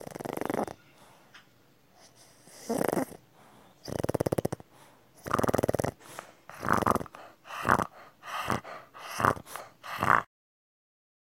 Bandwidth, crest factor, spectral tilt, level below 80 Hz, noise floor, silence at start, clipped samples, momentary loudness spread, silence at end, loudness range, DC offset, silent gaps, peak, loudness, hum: 17 kHz; 28 dB; -5 dB/octave; -56 dBFS; -63 dBFS; 0 s; under 0.1%; 20 LU; 1 s; 6 LU; under 0.1%; none; -4 dBFS; -31 LUFS; none